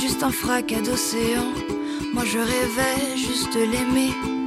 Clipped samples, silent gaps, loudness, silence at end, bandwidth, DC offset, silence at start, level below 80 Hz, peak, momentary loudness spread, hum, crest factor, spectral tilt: under 0.1%; none; -23 LUFS; 0 s; 16 kHz; under 0.1%; 0 s; -44 dBFS; -8 dBFS; 5 LU; none; 14 dB; -3.5 dB/octave